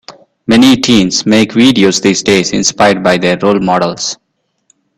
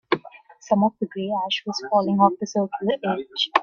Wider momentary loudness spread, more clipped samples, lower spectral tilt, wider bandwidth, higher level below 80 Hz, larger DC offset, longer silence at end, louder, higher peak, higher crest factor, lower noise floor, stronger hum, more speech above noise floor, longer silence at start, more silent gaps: about the same, 8 LU vs 7 LU; first, 0.1% vs under 0.1%; about the same, -4 dB/octave vs -5 dB/octave; first, 13.5 kHz vs 7.2 kHz; first, -44 dBFS vs -68 dBFS; neither; first, 0.85 s vs 0 s; first, -9 LUFS vs -23 LUFS; about the same, 0 dBFS vs 0 dBFS; second, 10 dB vs 22 dB; first, -56 dBFS vs -46 dBFS; neither; first, 47 dB vs 24 dB; about the same, 0.1 s vs 0.1 s; neither